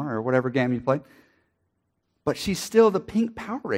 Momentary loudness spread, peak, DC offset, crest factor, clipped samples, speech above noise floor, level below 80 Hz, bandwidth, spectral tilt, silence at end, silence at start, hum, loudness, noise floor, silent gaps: 10 LU; -6 dBFS; under 0.1%; 20 dB; under 0.1%; 51 dB; -56 dBFS; 16 kHz; -6 dB/octave; 0 s; 0 s; none; -24 LUFS; -75 dBFS; none